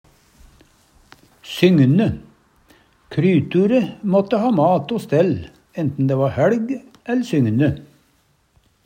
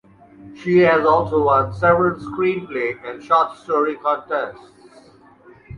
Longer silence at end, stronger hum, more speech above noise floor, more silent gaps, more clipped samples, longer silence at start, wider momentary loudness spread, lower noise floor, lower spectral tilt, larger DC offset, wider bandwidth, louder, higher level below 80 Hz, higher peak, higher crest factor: first, 1 s vs 0 s; neither; first, 44 dB vs 30 dB; neither; neither; first, 1.45 s vs 0.4 s; about the same, 12 LU vs 10 LU; first, -61 dBFS vs -48 dBFS; about the same, -8 dB/octave vs -8 dB/octave; neither; first, 16 kHz vs 10 kHz; about the same, -18 LUFS vs -18 LUFS; about the same, -52 dBFS vs -50 dBFS; about the same, -2 dBFS vs -2 dBFS; about the same, 18 dB vs 16 dB